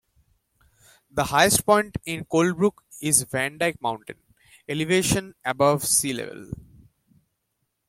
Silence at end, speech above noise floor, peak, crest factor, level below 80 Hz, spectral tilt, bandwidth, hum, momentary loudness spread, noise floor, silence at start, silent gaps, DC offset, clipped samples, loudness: 1.35 s; 53 dB; -2 dBFS; 24 dB; -52 dBFS; -3.5 dB/octave; 16.5 kHz; none; 16 LU; -77 dBFS; 1.15 s; none; under 0.1%; under 0.1%; -22 LUFS